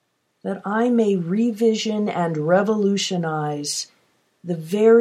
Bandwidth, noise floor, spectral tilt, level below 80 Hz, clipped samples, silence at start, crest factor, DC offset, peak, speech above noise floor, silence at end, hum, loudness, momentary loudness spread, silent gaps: 14.5 kHz; -63 dBFS; -5 dB/octave; -74 dBFS; under 0.1%; 0.45 s; 16 dB; under 0.1%; -4 dBFS; 43 dB; 0 s; none; -21 LUFS; 11 LU; none